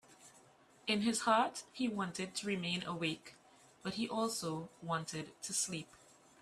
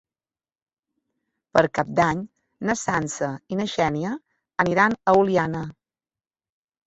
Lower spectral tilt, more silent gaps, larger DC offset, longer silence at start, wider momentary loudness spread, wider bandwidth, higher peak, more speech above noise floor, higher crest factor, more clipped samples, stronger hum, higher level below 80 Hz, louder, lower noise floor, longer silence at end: second, -3.5 dB/octave vs -5.5 dB/octave; neither; neither; second, 0.1 s vs 1.55 s; about the same, 12 LU vs 13 LU; first, 15 kHz vs 8.2 kHz; second, -18 dBFS vs -2 dBFS; second, 27 dB vs over 68 dB; about the same, 22 dB vs 22 dB; neither; neither; second, -76 dBFS vs -56 dBFS; second, -38 LUFS vs -23 LUFS; second, -65 dBFS vs under -90 dBFS; second, 0.45 s vs 1.15 s